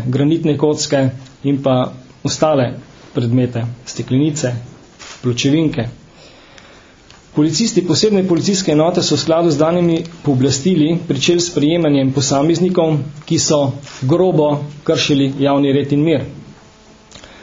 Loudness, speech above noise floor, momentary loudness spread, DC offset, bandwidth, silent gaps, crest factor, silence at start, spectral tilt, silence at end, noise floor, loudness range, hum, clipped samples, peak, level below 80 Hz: -15 LUFS; 29 dB; 10 LU; under 0.1%; 7.8 kHz; none; 16 dB; 0 s; -5.5 dB/octave; 0.15 s; -44 dBFS; 5 LU; none; under 0.1%; 0 dBFS; -48 dBFS